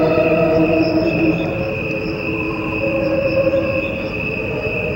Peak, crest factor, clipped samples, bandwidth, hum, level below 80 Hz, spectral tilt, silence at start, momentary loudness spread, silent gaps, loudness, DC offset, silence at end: -2 dBFS; 14 dB; under 0.1%; 16 kHz; none; -38 dBFS; -8 dB/octave; 0 s; 7 LU; none; -18 LUFS; under 0.1%; 0 s